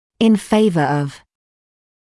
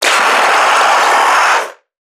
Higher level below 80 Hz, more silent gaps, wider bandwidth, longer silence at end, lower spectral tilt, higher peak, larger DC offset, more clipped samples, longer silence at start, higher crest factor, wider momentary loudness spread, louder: first, -54 dBFS vs -74 dBFS; neither; second, 12 kHz vs 19.5 kHz; first, 0.95 s vs 0.4 s; first, -6.5 dB/octave vs 1 dB/octave; second, -4 dBFS vs 0 dBFS; neither; neither; first, 0.2 s vs 0 s; about the same, 14 dB vs 12 dB; first, 8 LU vs 4 LU; second, -16 LUFS vs -9 LUFS